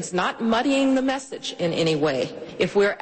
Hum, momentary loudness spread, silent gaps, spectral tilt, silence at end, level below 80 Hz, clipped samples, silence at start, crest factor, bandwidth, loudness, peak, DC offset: none; 8 LU; none; -4.5 dB/octave; 0 s; -58 dBFS; under 0.1%; 0 s; 14 dB; 8.8 kHz; -23 LUFS; -10 dBFS; under 0.1%